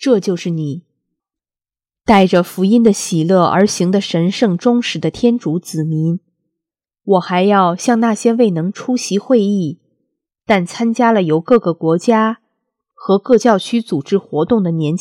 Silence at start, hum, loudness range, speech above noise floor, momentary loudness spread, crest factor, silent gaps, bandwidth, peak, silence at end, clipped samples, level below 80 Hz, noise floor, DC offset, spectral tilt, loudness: 0 s; none; 3 LU; over 76 dB; 8 LU; 14 dB; none; 15 kHz; 0 dBFS; 0 s; under 0.1%; -52 dBFS; under -90 dBFS; under 0.1%; -6 dB/octave; -15 LUFS